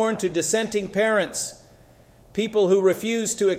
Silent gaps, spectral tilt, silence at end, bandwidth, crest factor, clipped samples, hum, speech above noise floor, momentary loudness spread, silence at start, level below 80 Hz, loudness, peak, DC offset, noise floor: none; -3.5 dB/octave; 0 s; 16 kHz; 14 dB; under 0.1%; none; 30 dB; 10 LU; 0 s; -60 dBFS; -22 LUFS; -8 dBFS; under 0.1%; -52 dBFS